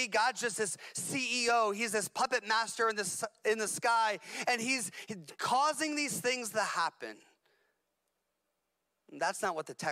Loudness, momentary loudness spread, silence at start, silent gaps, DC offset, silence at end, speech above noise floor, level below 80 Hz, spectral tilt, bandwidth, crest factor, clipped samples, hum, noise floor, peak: -32 LUFS; 7 LU; 0 s; none; under 0.1%; 0 s; 50 dB; -82 dBFS; -1.5 dB/octave; 16 kHz; 14 dB; under 0.1%; none; -84 dBFS; -20 dBFS